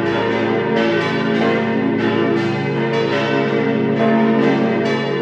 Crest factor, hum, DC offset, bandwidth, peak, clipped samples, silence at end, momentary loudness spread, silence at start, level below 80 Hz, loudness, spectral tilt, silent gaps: 14 dB; none; under 0.1%; 8 kHz; -4 dBFS; under 0.1%; 0 s; 3 LU; 0 s; -56 dBFS; -17 LUFS; -7 dB/octave; none